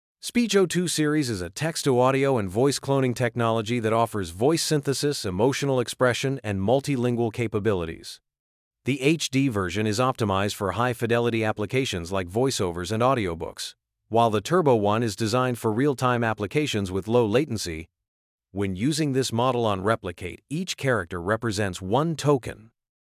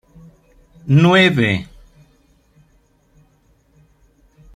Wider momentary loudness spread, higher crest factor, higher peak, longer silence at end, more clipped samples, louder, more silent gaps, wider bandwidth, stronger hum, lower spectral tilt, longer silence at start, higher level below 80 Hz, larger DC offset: second, 8 LU vs 23 LU; about the same, 18 dB vs 18 dB; second, -8 dBFS vs -2 dBFS; second, 0.45 s vs 2.9 s; neither; second, -24 LUFS vs -14 LUFS; first, 8.39-8.71 s, 18.08-18.38 s vs none; first, 16 kHz vs 10 kHz; neither; second, -5 dB/octave vs -6.5 dB/octave; second, 0.25 s vs 0.85 s; about the same, -50 dBFS vs -50 dBFS; neither